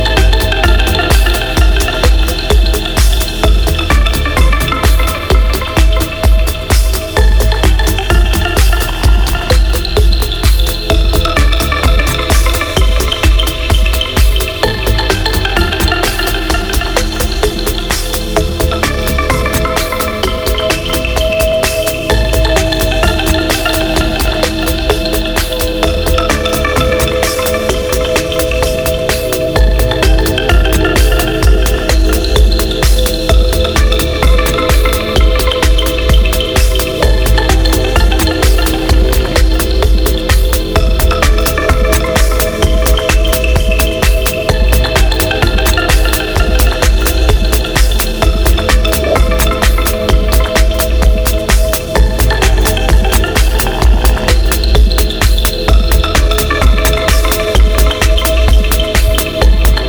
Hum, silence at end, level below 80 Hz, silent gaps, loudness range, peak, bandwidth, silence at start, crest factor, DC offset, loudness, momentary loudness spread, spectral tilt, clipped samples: none; 0 s; -12 dBFS; none; 2 LU; 0 dBFS; over 20 kHz; 0 s; 10 dB; under 0.1%; -12 LUFS; 3 LU; -4.5 dB/octave; under 0.1%